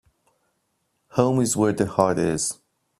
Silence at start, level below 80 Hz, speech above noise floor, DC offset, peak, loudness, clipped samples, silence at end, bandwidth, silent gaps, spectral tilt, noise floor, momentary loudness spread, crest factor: 1.15 s; -56 dBFS; 52 dB; under 0.1%; -2 dBFS; -22 LUFS; under 0.1%; 0.45 s; 15 kHz; none; -5 dB/octave; -73 dBFS; 7 LU; 22 dB